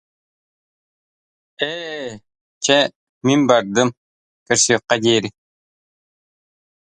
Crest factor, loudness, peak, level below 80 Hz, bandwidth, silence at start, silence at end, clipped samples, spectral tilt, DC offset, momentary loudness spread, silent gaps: 22 dB; -18 LUFS; 0 dBFS; -62 dBFS; 11.5 kHz; 1.6 s; 1.55 s; under 0.1%; -3 dB/octave; under 0.1%; 13 LU; 2.41-2.61 s, 2.96-3.21 s, 3.97-4.46 s